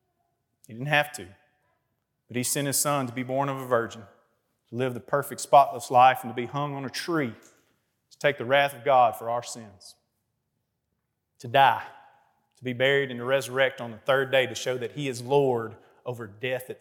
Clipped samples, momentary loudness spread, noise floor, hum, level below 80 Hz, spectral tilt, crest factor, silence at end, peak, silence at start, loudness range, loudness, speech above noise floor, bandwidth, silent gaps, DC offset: under 0.1%; 17 LU; -79 dBFS; none; -78 dBFS; -4 dB/octave; 22 dB; 0.05 s; -6 dBFS; 0.7 s; 5 LU; -25 LUFS; 53 dB; 18 kHz; none; under 0.1%